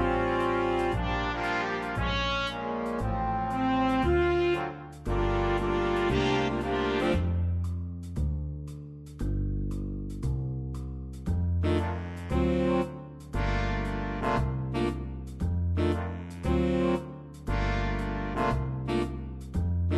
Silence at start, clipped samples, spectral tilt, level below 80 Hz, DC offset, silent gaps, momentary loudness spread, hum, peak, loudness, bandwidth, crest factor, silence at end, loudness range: 0 s; under 0.1%; -7 dB/octave; -36 dBFS; under 0.1%; none; 10 LU; none; -14 dBFS; -30 LUFS; 12 kHz; 14 dB; 0 s; 5 LU